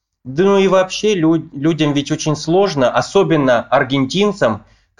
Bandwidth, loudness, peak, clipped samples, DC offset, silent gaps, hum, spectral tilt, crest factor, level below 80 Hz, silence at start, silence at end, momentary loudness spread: 11 kHz; -15 LUFS; -2 dBFS; under 0.1%; 0.4%; none; none; -5.5 dB/octave; 14 dB; -50 dBFS; 0.25 s; 0.4 s; 6 LU